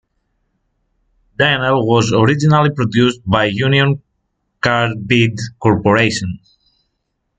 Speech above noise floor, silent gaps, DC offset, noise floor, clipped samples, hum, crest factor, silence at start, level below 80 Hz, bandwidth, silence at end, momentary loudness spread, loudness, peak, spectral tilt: 57 dB; none; under 0.1%; -71 dBFS; under 0.1%; none; 16 dB; 1.4 s; -46 dBFS; 9.2 kHz; 1 s; 7 LU; -14 LUFS; 0 dBFS; -6 dB/octave